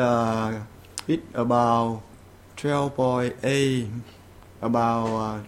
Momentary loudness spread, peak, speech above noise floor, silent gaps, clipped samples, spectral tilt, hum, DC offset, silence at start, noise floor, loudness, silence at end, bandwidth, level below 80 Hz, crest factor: 13 LU; -6 dBFS; 24 dB; none; under 0.1%; -6 dB/octave; none; under 0.1%; 0 s; -47 dBFS; -25 LUFS; 0 s; 15.5 kHz; -54 dBFS; 18 dB